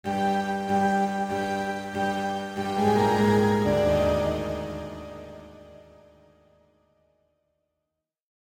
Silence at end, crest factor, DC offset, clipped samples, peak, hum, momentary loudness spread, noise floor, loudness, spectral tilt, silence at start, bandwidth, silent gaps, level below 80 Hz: 2.8 s; 16 dB; under 0.1%; under 0.1%; -12 dBFS; none; 16 LU; -84 dBFS; -25 LUFS; -6.5 dB/octave; 0.05 s; 16 kHz; none; -48 dBFS